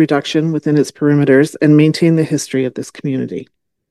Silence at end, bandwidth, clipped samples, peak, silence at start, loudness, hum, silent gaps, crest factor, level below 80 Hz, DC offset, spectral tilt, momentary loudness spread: 0.5 s; 12.5 kHz; under 0.1%; 0 dBFS; 0 s; -14 LUFS; none; none; 14 dB; -62 dBFS; under 0.1%; -6.5 dB/octave; 11 LU